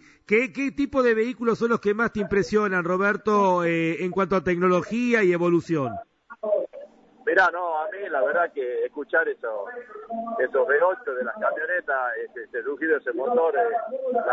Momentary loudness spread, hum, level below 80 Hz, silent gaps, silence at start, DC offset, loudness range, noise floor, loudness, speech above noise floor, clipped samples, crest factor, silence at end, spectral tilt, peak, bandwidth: 11 LU; none; -58 dBFS; none; 0.3 s; under 0.1%; 3 LU; -45 dBFS; -24 LUFS; 22 dB; under 0.1%; 18 dB; 0 s; -6.5 dB/octave; -6 dBFS; 8 kHz